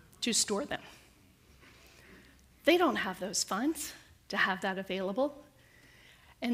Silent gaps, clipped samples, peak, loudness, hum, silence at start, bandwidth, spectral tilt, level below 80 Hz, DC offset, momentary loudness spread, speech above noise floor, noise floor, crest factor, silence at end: none; under 0.1%; -12 dBFS; -32 LUFS; none; 0.2 s; 15.5 kHz; -2.5 dB/octave; -66 dBFS; under 0.1%; 13 LU; 30 dB; -61 dBFS; 22 dB; 0 s